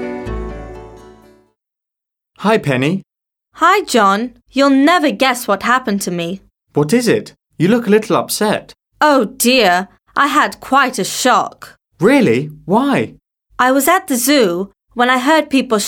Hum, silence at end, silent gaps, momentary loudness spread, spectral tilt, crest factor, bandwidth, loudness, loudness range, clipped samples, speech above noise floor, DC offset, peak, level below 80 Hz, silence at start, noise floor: none; 0 s; none; 13 LU; -4 dB/octave; 14 dB; 18 kHz; -14 LUFS; 3 LU; under 0.1%; 70 dB; under 0.1%; -2 dBFS; -42 dBFS; 0 s; -83 dBFS